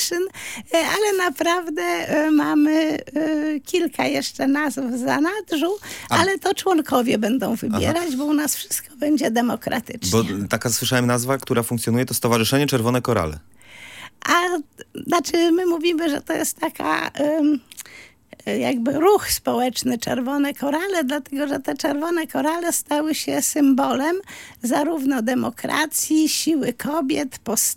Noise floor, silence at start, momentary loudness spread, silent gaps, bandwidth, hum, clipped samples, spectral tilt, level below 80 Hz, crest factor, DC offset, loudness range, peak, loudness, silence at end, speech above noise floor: -41 dBFS; 0 s; 7 LU; none; 17 kHz; none; under 0.1%; -4 dB/octave; -54 dBFS; 18 dB; under 0.1%; 2 LU; -2 dBFS; -21 LUFS; 0 s; 20 dB